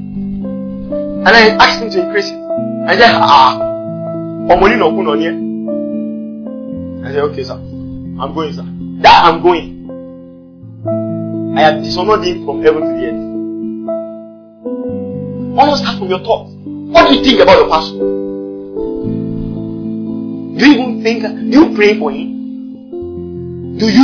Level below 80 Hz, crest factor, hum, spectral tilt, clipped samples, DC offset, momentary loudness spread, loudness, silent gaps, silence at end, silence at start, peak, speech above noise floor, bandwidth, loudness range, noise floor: -38 dBFS; 12 dB; none; -5.5 dB/octave; 1%; under 0.1%; 18 LU; -12 LUFS; none; 0 s; 0 s; 0 dBFS; 24 dB; 5.4 kHz; 7 LU; -34 dBFS